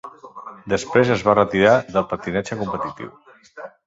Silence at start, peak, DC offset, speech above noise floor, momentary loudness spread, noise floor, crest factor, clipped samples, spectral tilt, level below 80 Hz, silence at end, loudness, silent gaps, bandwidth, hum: 0.05 s; -2 dBFS; under 0.1%; 20 dB; 23 LU; -40 dBFS; 18 dB; under 0.1%; -6 dB/octave; -50 dBFS; 0.2 s; -19 LUFS; none; 8 kHz; none